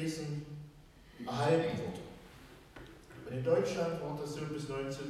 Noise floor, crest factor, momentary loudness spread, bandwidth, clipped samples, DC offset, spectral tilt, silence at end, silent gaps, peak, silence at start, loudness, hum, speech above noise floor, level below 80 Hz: -57 dBFS; 18 dB; 22 LU; 14.5 kHz; under 0.1%; under 0.1%; -6 dB/octave; 0 s; none; -18 dBFS; 0 s; -36 LUFS; none; 22 dB; -62 dBFS